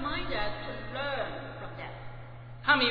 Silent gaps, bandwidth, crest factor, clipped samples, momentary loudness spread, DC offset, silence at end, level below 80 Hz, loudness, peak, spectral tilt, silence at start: none; 5.2 kHz; 22 dB; under 0.1%; 18 LU; under 0.1%; 0 s; -46 dBFS; -33 LUFS; -10 dBFS; -7 dB/octave; 0 s